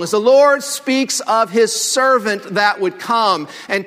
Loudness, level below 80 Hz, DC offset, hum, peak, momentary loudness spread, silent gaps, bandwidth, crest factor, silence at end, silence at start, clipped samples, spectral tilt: -15 LUFS; -68 dBFS; under 0.1%; none; 0 dBFS; 8 LU; none; 16 kHz; 14 dB; 0 s; 0 s; under 0.1%; -2.5 dB/octave